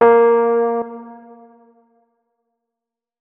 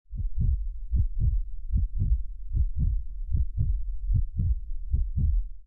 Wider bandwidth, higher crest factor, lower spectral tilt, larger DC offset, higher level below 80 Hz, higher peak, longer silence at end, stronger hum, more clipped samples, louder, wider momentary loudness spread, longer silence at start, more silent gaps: first, 3.5 kHz vs 0.6 kHz; first, 18 dB vs 12 dB; second, -8.5 dB/octave vs -13.5 dB/octave; neither; second, -66 dBFS vs -28 dBFS; first, -2 dBFS vs -14 dBFS; first, 2.05 s vs 0.05 s; neither; neither; first, -15 LUFS vs -31 LUFS; first, 24 LU vs 6 LU; about the same, 0 s vs 0.1 s; neither